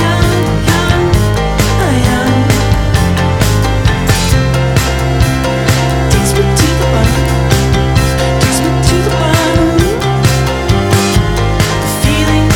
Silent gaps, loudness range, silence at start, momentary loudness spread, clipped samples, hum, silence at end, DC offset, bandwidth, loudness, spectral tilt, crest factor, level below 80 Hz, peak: none; 1 LU; 0 s; 2 LU; under 0.1%; none; 0 s; under 0.1%; 19 kHz; -11 LUFS; -5 dB/octave; 10 dB; -18 dBFS; 0 dBFS